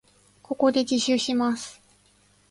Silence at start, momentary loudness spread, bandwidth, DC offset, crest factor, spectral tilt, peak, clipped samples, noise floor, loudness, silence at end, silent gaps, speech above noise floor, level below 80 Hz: 0.5 s; 12 LU; 11.5 kHz; under 0.1%; 18 dB; -3 dB/octave; -8 dBFS; under 0.1%; -61 dBFS; -24 LUFS; 0.8 s; none; 38 dB; -66 dBFS